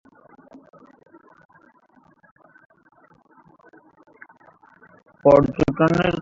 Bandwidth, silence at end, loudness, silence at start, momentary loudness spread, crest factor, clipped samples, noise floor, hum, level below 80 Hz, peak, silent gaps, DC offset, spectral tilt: 7.6 kHz; 0 s; -18 LUFS; 5.25 s; 6 LU; 22 dB; under 0.1%; -57 dBFS; none; -48 dBFS; -2 dBFS; none; under 0.1%; -8 dB/octave